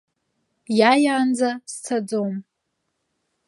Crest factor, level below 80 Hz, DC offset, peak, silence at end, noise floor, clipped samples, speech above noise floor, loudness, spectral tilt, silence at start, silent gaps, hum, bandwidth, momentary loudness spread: 22 dB; -78 dBFS; under 0.1%; -2 dBFS; 1.05 s; -76 dBFS; under 0.1%; 56 dB; -21 LUFS; -4.5 dB/octave; 0.7 s; none; none; 11.5 kHz; 13 LU